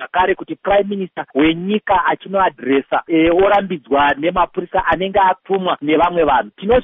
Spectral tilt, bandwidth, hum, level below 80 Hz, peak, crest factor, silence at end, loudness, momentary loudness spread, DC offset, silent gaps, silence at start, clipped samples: -3.5 dB/octave; 3.9 kHz; none; -42 dBFS; -4 dBFS; 12 dB; 0 s; -16 LUFS; 5 LU; under 0.1%; none; 0 s; under 0.1%